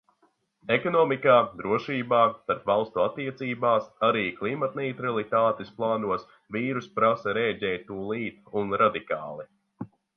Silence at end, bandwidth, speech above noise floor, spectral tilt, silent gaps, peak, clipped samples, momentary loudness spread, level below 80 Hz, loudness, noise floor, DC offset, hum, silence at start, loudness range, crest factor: 0.3 s; 6.4 kHz; 42 dB; -7.5 dB/octave; none; -6 dBFS; under 0.1%; 11 LU; -64 dBFS; -26 LUFS; -68 dBFS; under 0.1%; none; 0.65 s; 3 LU; 20 dB